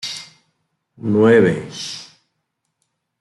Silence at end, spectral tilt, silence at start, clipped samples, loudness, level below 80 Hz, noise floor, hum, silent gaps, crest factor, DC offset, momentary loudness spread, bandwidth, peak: 1.15 s; -5.5 dB/octave; 0.05 s; under 0.1%; -17 LUFS; -62 dBFS; -74 dBFS; none; none; 18 dB; under 0.1%; 19 LU; 12 kHz; -2 dBFS